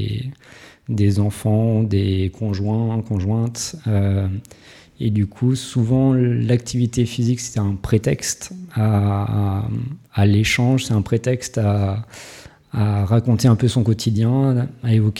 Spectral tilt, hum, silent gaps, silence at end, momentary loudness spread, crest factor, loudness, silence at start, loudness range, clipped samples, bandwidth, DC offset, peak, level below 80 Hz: -6.5 dB/octave; none; none; 0 s; 10 LU; 16 dB; -19 LUFS; 0 s; 2 LU; under 0.1%; 13.5 kHz; under 0.1%; -4 dBFS; -44 dBFS